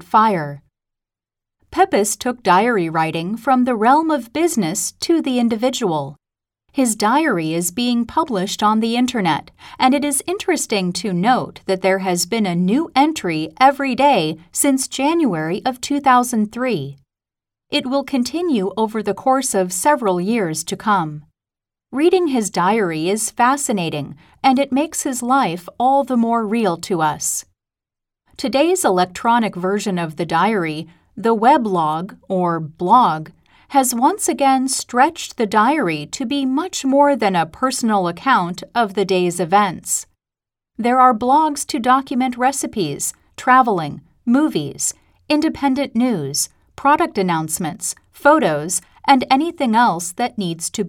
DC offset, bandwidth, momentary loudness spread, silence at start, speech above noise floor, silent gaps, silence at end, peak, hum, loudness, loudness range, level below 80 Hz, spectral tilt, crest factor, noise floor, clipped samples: under 0.1%; 18 kHz; 8 LU; 0.1 s; 70 dB; none; 0 s; 0 dBFS; none; -18 LUFS; 2 LU; -56 dBFS; -4 dB/octave; 18 dB; -87 dBFS; under 0.1%